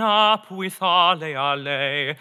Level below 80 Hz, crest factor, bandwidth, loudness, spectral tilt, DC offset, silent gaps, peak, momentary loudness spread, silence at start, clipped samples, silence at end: under -90 dBFS; 18 dB; 15 kHz; -20 LUFS; -4 dB/octave; under 0.1%; none; -2 dBFS; 7 LU; 0 s; under 0.1%; 0.05 s